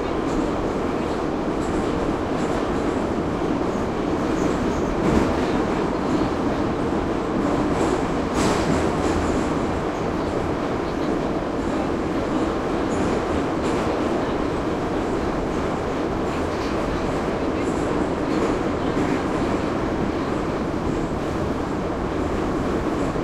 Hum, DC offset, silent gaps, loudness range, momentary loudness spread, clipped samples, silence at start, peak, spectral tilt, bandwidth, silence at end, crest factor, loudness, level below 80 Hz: none; under 0.1%; none; 2 LU; 3 LU; under 0.1%; 0 s; -8 dBFS; -6.5 dB/octave; 13.5 kHz; 0 s; 16 dB; -23 LUFS; -36 dBFS